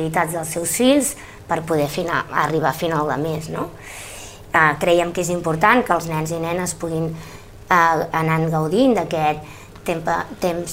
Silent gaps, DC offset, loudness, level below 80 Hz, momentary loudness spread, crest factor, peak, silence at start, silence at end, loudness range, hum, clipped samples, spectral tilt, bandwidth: none; under 0.1%; -19 LUFS; -46 dBFS; 15 LU; 20 dB; 0 dBFS; 0 s; 0 s; 2 LU; none; under 0.1%; -4.5 dB/octave; 16 kHz